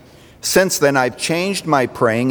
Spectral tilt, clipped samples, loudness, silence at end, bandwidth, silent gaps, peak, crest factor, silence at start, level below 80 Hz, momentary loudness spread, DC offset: -4 dB/octave; under 0.1%; -17 LUFS; 0 s; over 20 kHz; none; -2 dBFS; 16 dB; 0.45 s; -54 dBFS; 5 LU; under 0.1%